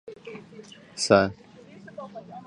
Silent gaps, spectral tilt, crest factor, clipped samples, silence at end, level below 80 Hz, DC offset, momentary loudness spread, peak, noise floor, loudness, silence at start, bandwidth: none; -4 dB/octave; 26 dB; under 0.1%; 0.05 s; -58 dBFS; under 0.1%; 26 LU; -4 dBFS; -48 dBFS; -22 LUFS; 0.1 s; 11 kHz